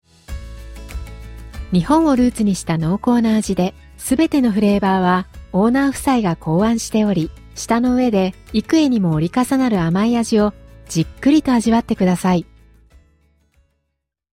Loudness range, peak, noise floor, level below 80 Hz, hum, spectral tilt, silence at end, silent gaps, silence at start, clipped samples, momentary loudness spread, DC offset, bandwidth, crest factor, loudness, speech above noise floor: 2 LU; -4 dBFS; -75 dBFS; -38 dBFS; none; -6 dB/octave; 1.95 s; none; 0.3 s; under 0.1%; 17 LU; under 0.1%; 16 kHz; 14 dB; -17 LUFS; 59 dB